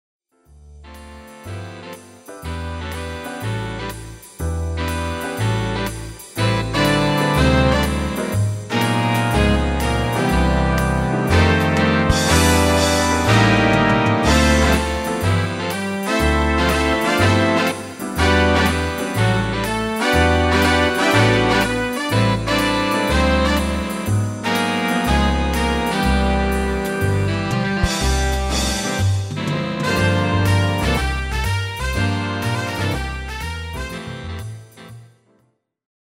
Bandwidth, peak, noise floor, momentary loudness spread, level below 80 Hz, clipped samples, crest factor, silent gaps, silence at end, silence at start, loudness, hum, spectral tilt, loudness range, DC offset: 16 kHz; -2 dBFS; -63 dBFS; 13 LU; -28 dBFS; under 0.1%; 16 dB; none; 0.95 s; 0.65 s; -18 LUFS; none; -5 dB/octave; 10 LU; under 0.1%